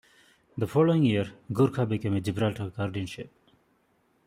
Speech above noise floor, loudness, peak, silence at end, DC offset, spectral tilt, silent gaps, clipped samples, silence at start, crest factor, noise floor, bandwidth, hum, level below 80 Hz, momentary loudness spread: 42 dB; -27 LUFS; -10 dBFS; 1 s; under 0.1%; -7.5 dB/octave; none; under 0.1%; 0.55 s; 18 dB; -68 dBFS; 15.5 kHz; none; -62 dBFS; 15 LU